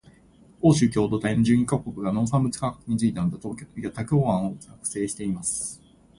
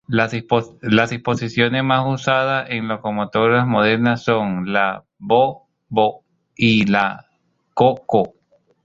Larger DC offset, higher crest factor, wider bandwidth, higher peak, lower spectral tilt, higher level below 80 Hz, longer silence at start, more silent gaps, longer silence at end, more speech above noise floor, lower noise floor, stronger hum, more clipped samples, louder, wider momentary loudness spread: neither; about the same, 18 dB vs 18 dB; first, 11.5 kHz vs 7.6 kHz; second, -6 dBFS vs 0 dBFS; about the same, -6 dB/octave vs -6.5 dB/octave; about the same, -52 dBFS vs -54 dBFS; first, 0.6 s vs 0.1 s; neither; second, 0.4 s vs 0.55 s; second, 30 dB vs 47 dB; second, -54 dBFS vs -65 dBFS; neither; neither; second, -25 LUFS vs -18 LUFS; first, 13 LU vs 7 LU